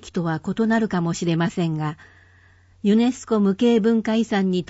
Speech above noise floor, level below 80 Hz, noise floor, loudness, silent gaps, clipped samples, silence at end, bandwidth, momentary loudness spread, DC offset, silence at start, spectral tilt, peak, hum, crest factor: 33 dB; -56 dBFS; -53 dBFS; -21 LUFS; none; under 0.1%; 0.05 s; 8 kHz; 8 LU; under 0.1%; 0.05 s; -6.5 dB/octave; -8 dBFS; none; 14 dB